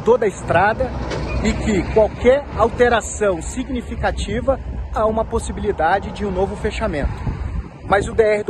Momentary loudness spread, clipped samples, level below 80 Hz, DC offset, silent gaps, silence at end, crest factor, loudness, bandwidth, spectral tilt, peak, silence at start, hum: 9 LU; under 0.1%; -28 dBFS; under 0.1%; none; 0 s; 18 dB; -19 LUFS; 10.5 kHz; -5.5 dB/octave; -2 dBFS; 0 s; none